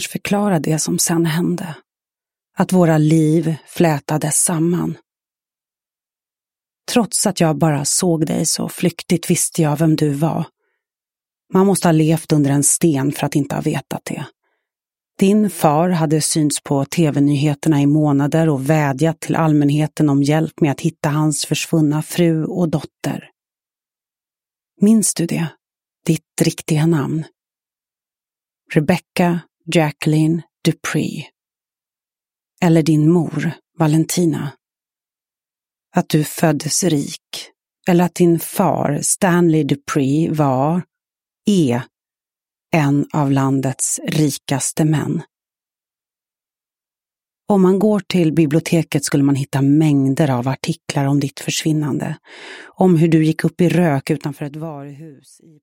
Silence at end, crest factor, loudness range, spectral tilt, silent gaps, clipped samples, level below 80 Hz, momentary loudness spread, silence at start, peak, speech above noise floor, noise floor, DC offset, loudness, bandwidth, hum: 0.5 s; 18 dB; 5 LU; -5.5 dB/octave; none; under 0.1%; -58 dBFS; 11 LU; 0 s; 0 dBFS; over 74 dB; under -90 dBFS; under 0.1%; -17 LUFS; 16.5 kHz; none